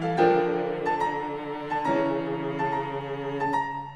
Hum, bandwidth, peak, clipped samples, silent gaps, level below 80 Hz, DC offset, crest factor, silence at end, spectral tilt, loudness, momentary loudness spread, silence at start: none; 10 kHz; -8 dBFS; under 0.1%; none; -60 dBFS; 0.1%; 18 dB; 0 s; -7 dB/octave; -27 LUFS; 10 LU; 0 s